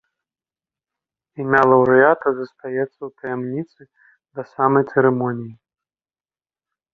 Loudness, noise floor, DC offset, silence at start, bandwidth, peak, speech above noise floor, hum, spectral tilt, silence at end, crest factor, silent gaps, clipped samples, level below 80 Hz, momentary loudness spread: -18 LUFS; under -90 dBFS; under 0.1%; 1.4 s; 5.2 kHz; -2 dBFS; over 72 dB; none; -9.5 dB/octave; 1.4 s; 20 dB; none; under 0.1%; -62 dBFS; 20 LU